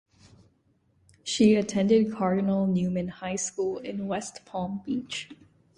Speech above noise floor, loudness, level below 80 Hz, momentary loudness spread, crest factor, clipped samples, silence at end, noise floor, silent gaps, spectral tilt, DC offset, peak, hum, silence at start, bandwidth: 41 dB; -27 LUFS; -62 dBFS; 14 LU; 18 dB; under 0.1%; 0.45 s; -67 dBFS; none; -5.5 dB/octave; under 0.1%; -8 dBFS; none; 1.25 s; 11 kHz